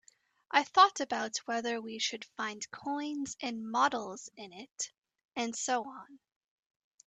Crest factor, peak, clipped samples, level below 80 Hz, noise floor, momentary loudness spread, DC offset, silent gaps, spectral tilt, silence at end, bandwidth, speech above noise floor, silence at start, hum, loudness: 26 dB; -10 dBFS; under 0.1%; -80 dBFS; -61 dBFS; 19 LU; under 0.1%; 4.71-4.76 s, 4.98-5.02 s; -1.5 dB/octave; 0.9 s; 9.2 kHz; 28 dB; 0.5 s; none; -32 LUFS